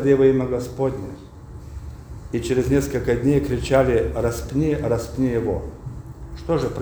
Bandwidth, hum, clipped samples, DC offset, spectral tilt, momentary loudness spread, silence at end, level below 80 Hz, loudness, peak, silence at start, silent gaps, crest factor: over 20 kHz; none; under 0.1%; under 0.1%; -7 dB/octave; 20 LU; 0 s; -36 dBFS; -21 LUFS; -4 dBFS; 0 s; none; 18 dB